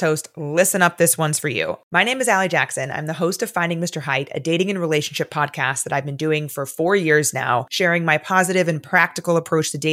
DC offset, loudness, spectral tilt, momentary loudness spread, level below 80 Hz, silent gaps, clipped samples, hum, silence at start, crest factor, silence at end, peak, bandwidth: under 0.1%; -19 LUFS; -3.5 dB/octave; 7 LU; -70 dBFS; 1.83-1.91 s; under 0.1%; none; 0 s; 18 dB; 0 s; -2 dBFS; 16.5 kHz